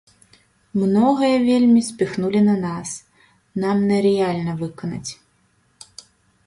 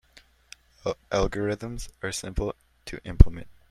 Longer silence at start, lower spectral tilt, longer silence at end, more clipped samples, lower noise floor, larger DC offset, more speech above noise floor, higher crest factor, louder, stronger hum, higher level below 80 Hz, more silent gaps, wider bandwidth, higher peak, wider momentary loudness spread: about the same, 0.75 s vs 0.85 s; about the same, -6.5 dB/octave vs -6 dB/octave; first, 1.35 s vs 0.25 s; neither; first, -62 dBFS vs -57 dBFS; neither; first, 44 dB vs 34 dB; second, 16 dB vs 24 dB; first, -19 LUFS vs -27 LUFS; neither; second, -58 dBFS vs -28 dBFS; neither; second, 11.5 kHz vs 13 kHz; second, -6 dBFS vs 0 dBFS; about the same, 16 LU vs 18 LU